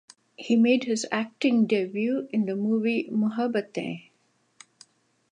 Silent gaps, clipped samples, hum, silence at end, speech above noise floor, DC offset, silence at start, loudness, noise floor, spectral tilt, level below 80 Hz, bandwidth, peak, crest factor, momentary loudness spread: none; under 0.1%; none; 1.3 s; 44 dB; under 0.1%; 0.4 s; -25 LUFS; -68 dBFS; -5.5 dB/octave; -80 dBFS; 10 kHz; -10 dBFS; 16 dB; 11 LU